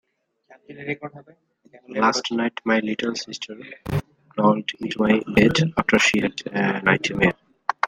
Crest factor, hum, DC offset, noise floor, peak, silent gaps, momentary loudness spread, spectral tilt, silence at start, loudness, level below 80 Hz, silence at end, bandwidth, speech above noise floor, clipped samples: 20 dB; none; under 0.1%; -57 dBFS; -2 dBFS; none; 15 LU; -5 dB/octave; 0.7 s; -22 LUFS; -50 dBFS; 0 s; 15.5 kHz; 35 dB; under 0.1%